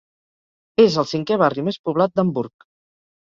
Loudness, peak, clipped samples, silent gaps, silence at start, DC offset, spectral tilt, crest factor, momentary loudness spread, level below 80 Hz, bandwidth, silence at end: -19 LUFS; -2 dBFS; under 0.1%; 1.79-1.84 s; 0.8 s; under 0.1%; -6.5 dB/octave; 18 dB; 9 LU; -62 dBFS; 7.6 kHz; 0.8 s